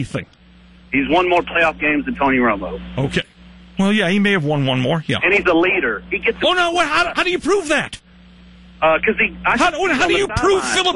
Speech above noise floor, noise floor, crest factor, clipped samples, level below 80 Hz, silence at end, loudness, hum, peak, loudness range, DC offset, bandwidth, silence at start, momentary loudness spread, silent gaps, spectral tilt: 29 dB; -45 dBFS; 14 dB; under 0.1%; -42 dBFS; 0 s; -17 LUFS; none; -4 dBFS; 2 LU; under 0.1%; 11.5 kHz; 0 s; 8 LU; none; -4.5 dB/octave